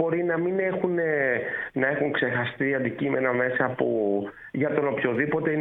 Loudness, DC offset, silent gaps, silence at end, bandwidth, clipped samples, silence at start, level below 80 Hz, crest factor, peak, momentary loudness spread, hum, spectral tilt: -25 LUFS; under 0.1%; none; 0 s; 4 kHz; under 0.1%; 0 s; -64 dBFS; 18 dB; -8 dBFS; 3 LU; none; -9.5 dB/octave